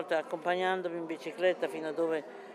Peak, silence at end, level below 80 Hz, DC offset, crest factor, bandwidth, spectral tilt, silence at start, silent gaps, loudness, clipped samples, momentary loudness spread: -16 dBFS; 0 s; under -90 dBFS; under 0.1%; 18 dB; 13 kHz; -5 dB/octave; 0 s; none; -33 LUFS; under 0.1%; 7 LU